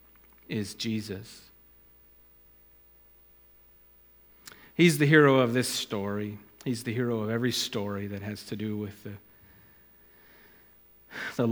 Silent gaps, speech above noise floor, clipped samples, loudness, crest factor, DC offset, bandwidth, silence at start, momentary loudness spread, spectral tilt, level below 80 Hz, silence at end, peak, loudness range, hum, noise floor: none; 31 dB; under 0.1%; -28 LUFS; 24 dB; under 0.1%; 19.5 kHz; 0.5 s; 24 LU; -5 dB/octave; -68 dBFS; 0 s; -6 dBFS; 15 LU; 60 Hz at -55 dBFS; -58 dBFS